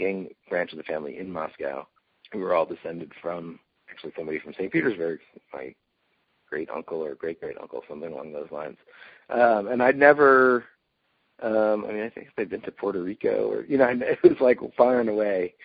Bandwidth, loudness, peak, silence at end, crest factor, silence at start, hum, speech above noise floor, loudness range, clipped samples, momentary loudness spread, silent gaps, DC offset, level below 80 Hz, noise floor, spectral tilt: 4.9 kHz; -24 LUFS; -2 dBFS; 0.15 s; 22 dB; 0 s; none; 48 dB; 14 LU; under 0.1%; 19 LU; none; under 0.1%; -68 dBFS; -72 dBFS; -4.5 dB/octave